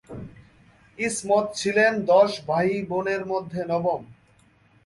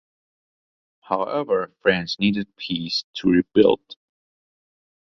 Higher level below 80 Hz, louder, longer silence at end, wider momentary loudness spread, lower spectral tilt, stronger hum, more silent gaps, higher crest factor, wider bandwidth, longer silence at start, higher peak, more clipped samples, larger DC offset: about the same, -60 dBFS vs -56 dBFS; about the same, -23 LUFS vs -22 LUFS; second, 0.7 s vs 1.25 s; about the same, 12 LU vs 10 LU; second, -4.5 dB/octave vs -6 dB/octave; neither; second, none vs 3.04-3.13 s; about the same, 18 dB vs 22 dB; first, 11.5 kHz vs 7.2 kHz; second, 0.1 s vs 1.1 s; second, -6 dBFS vs -2 dBFS; neither; neither